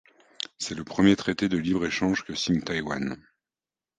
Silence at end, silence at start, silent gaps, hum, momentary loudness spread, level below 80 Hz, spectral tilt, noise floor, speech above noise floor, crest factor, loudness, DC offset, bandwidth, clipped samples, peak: 0.8 s; 0.6 s; none; none; 13 LU; -54 dBFS; -5 dB/octave; under -90 dBFS; over 64 dB; 22 dB; -26 LUFS; under 0.1%; 9.4 kHz; under 0.1%; -6 dBFS